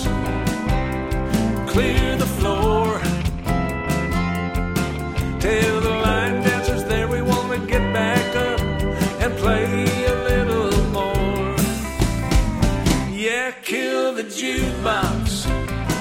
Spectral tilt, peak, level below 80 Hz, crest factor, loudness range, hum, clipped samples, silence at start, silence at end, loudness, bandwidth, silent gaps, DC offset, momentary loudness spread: -5.5 dB/octave; -2 dBFS; -28 dBFS; 18 dB; 2 LU; none; under 0.1%; 0 s; 0 s; -21 LUFS; 17 kHz; none; under 0.1%; 4 LU